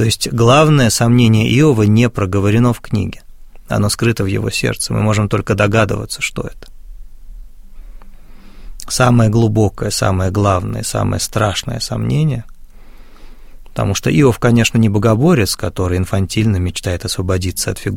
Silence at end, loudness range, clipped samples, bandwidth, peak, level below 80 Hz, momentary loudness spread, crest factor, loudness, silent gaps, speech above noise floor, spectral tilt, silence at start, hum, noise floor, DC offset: 0 s; 6 LU; under 0.1%; 16.5 kHz; 0 dBFS; -34 dBFS; 9 LU; 14 dB; -14 LUFS; none; 21 dB; -5.5 dB/octave; 0 s; none; -35 dBFS; under 0.1%